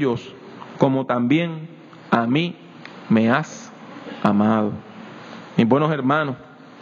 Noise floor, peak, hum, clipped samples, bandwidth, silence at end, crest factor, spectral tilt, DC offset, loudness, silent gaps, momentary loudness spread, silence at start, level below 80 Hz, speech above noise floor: -38 dBFS; -2 dBFS; none; under 0.1%; 7.4 kHz; 0.35 s; 20 dB; -7 dB/octave; under 0.1%; -20 LUFS; none; 21 LU; 0 s; -66 dBFS; 19 dB